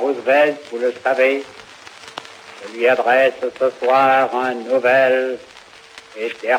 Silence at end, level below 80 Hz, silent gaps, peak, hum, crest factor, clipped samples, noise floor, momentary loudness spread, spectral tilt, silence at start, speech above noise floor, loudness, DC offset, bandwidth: 0 s; -70 dBFS; none; -4 dBFS; none; 14 dB; under 0.1%; -42 dBFS; 21 LU; -4 dB/octave; 0 s; 25 dB; -17 LUFS; under 0.1%; 12.5 kHz